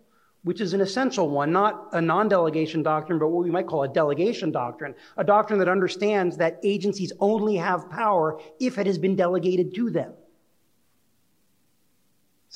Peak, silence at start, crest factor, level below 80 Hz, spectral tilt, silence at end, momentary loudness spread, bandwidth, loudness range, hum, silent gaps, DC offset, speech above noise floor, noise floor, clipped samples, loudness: -6 dBFS; 0.45 s; 18 dB; -74 dBFS; -6.5 dB/octave; 2.4 s; 7 LU; 10 kHz; 4 LU; none; none; under 0.1%; 46 dB; -69 dBFS; under 0.1%; -24 LUFS